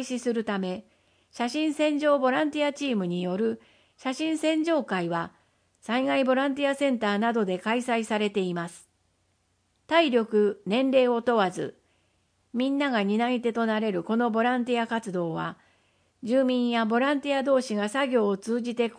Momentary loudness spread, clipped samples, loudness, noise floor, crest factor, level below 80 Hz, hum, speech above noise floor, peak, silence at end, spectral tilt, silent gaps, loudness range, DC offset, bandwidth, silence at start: 9 LU; under 0.1%; -26 LUFS; -71 dBFS; 18 dB; -74 dBFS; none; 45 dB; -10 dBFS; 0.05 s; -5.5 dB/octave; none; 2 LU; under 0.1%; 10.5 kHz; 0 s